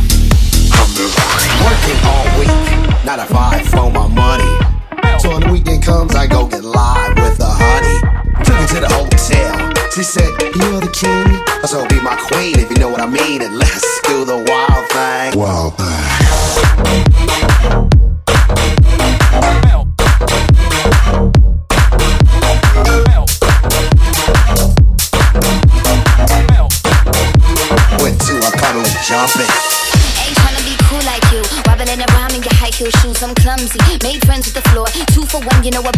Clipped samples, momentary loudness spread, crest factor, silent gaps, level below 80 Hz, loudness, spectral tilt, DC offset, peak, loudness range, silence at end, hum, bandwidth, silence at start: under 0.1%; 4 LU; 10 dB; none; -12 dBFS; -11 LUFS; -4.5 dB/octave; under 0.1%; 0 dBFS; 3 LU; 0 s; none; 16 kHz; 0 s